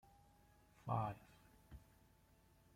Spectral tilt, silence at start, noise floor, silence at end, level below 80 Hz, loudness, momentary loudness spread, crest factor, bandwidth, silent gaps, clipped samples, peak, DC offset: -8 dB/octave; 0.85 s; -72 dBFS; 0.95 s; -70 dBFS; -45 LUFS; 21 LU; 24 dB; 16.5 kHz; none; under 0.1%; -28 dBFS; under 0.1%